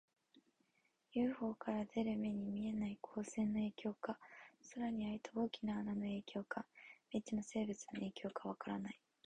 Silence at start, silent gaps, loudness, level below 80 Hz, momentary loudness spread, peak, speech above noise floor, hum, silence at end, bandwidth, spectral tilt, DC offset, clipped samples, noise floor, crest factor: 0.35 s; none; -44 LUFS; -72 dBFS; 8 LU; -28 dBFS; 38 dB; none; 0.3 s; 9.8 kHz; -6 dB/octave; under 0.1%; under 0.1%; -81 dBFS; 16 dB